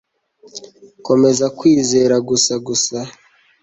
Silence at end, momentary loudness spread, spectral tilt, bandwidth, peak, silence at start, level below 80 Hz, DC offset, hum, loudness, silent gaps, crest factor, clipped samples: 0.5 s; 22 LU; -4 dB/octave; 8.2 kHz; -2 dBFS; 0.55 s; -56 dBFS; under 0.1%; none; -15 LUFS; none; 16 dB; under 0.1%